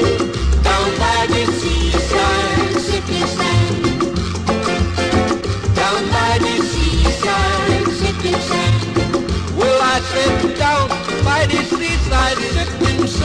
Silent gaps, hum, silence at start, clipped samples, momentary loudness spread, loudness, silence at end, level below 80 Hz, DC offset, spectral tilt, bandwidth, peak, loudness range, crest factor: none; none; 0 s; under 0.1%; 4 LU; -16 LUFS; 0 s; -24 dBFS; 0.4%; -5 dB/octave; 10.5 kHz; -2 dBFS; 1 LU; 14 dB